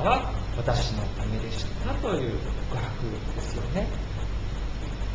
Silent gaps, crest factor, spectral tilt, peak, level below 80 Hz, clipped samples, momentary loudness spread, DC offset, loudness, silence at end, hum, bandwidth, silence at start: none; 18 dB; -6 dB/octave; -10 dBFS; -32 dBFS; under 0.1%; 7 LU; under 0.1%; -30 LUFS; 0 s; none; 8 kHz; 0 s